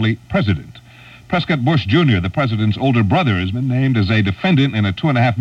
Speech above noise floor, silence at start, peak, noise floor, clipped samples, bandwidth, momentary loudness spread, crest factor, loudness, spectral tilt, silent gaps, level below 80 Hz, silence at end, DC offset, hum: 26 dB; 0 s; -2 dBFS; -41 dBFS; under 0.1%; 7.4 kHz; 5 LU; 14 dB; -16 LUFS; -8 dB/octave; none; -42 dBFS; 0 s; under 0.1%; none